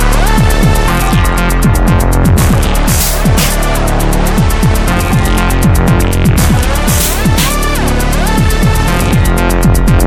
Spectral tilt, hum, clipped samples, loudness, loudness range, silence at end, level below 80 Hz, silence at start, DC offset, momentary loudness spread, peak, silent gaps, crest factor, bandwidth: -5 dB/octave; none; under 0.1%; -10 LUFS; 1 LU; 0 s; -12 dBFS; 0 s; under 0.1%; 3 LU; 0 dBFS; none; 8 dB; 17.5 kHz